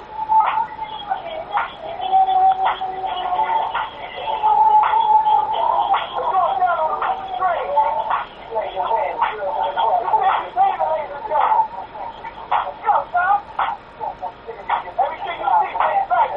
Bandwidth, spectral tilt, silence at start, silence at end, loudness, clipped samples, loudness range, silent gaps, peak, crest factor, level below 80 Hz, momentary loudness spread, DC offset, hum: 5.4 kHz; -5.5 dB/octave; 0 s; 0 s; -19 LUFS; under 0.1%; 4 LU; none; -4 dBFS; 14 dB; -52 dBFS; 12 LU; under 0.1%; none